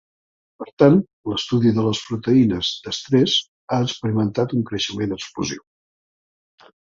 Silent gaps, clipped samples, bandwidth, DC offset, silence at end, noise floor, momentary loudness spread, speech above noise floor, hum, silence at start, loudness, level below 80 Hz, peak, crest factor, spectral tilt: 0.73-0.77 s, 1.13-1.24 s, 3.48-3.68 s; under 0.1%; 7.6 kHz; under 0.1%; 1.3 s; under -90 dBFS; 11 LU; over 70 dB; none; 0.6 s; -20 LUFS; -52 dBFS; -2 dBFS; 18 dB; -6 dB/octave